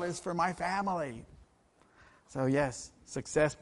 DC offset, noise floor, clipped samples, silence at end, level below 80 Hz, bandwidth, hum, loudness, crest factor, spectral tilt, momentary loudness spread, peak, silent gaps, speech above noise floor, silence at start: under 0.1%; -66 dBFS; under 0.1%; 0.05 s; -60 dBFS; 11.5 kHz; none; -33 LUFS; 18 dB; -5.5 dB/octave; 13 LU; -16 dBFS; none; 34 dB; 0 s